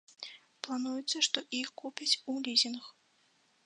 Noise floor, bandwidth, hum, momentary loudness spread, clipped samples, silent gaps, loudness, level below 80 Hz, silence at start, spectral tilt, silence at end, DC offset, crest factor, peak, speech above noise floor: -70 dBFS; 11 kHz; none; 18 LU; under 0.1%; none; -32 LUFS; under -90 dBFS; 0.2 s; 0 dB/octave; 0.75 s; under 0.1%; 26 dB; -10 dBFS; 36 dB